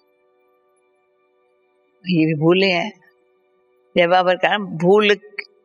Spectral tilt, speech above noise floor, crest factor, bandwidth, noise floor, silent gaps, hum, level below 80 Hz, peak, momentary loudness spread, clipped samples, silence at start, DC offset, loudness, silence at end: -6.5 dB/octave; 46 dB; 20 dB; 7.4 kHz; -62 dBFS; none; none; -70 dBFS; -2 dBFS; 10 LU; under 0.1%; 2.05 s; under 0.1%; -17 LUFS; 0.25 s